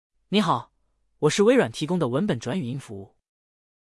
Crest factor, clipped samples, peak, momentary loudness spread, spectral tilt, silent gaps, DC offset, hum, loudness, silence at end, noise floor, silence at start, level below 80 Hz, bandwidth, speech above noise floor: 18 dB; under 0.1%; -6 dBFS; 15 LU; -5.5 dB/octave; none; under 0.1%; none; -24 LUFS; 0.95 s; -68 dBFS; 0.3 s; -64 dBFS; 12 kHz; 45 dB